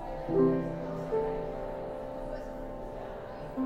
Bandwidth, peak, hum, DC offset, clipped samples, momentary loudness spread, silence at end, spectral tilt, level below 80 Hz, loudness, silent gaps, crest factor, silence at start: 9.4 kHz; -16 dBFS; none; under 0.1%; under 0.1%; 14 LU; 0 s; -9 dB/octave; -46 dBFS; -34 LUFS; none; 18 dB; 0 s